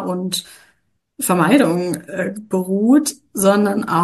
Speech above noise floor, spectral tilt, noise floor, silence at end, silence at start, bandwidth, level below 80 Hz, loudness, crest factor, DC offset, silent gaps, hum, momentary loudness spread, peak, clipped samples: 46 dB; -5 dB/octave; -63 dBFS; 0 s; 0 s; 13 kHz; -62 dBFS; -17 LUFS; 16 dB; under 0.1%; none; none; 10 LU; -2 dBFS; under 0.1%